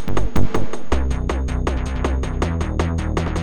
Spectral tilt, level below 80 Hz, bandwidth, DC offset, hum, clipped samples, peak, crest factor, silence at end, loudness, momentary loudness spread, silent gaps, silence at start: -6.5 dB/octave; -24 dBFS; 16.5 kHz; under 0.1%; none; under 0.1%; -2 dBFS; 14 dB; 0 s; -23 LUFS; 2 LU; none; 0 s